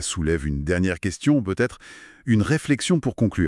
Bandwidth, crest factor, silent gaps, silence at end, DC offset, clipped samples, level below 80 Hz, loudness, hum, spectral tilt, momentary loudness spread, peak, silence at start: 12 kHz; 16 dB; none; 0 s; under 0.1%; under 0.1%; -40 dBFS; -23 LUFS; none; -5.5 dB/octave; 6 LU; -6 dBFS; 0 s